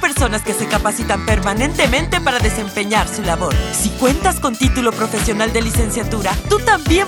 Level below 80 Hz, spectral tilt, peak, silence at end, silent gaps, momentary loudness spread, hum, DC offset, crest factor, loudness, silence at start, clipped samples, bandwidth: -24 dBFS; -4 dB/octave; -2 dBFS; 0 s; none; 4 LU; none; under 0.1%; 14 dB; -16 LUFS; 0 s; under 0.1%; 20 kHz